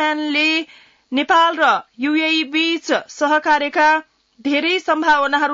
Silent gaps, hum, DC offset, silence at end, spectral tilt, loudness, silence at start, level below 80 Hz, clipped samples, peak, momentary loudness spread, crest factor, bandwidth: none; none; under 0.1%; 0 s; -2 dB/octave; -17 LUFS; 0 s; -60 dBFS; under 0.1%; -6 dBFS; 7 LU; 12 dB; 7.8 kHz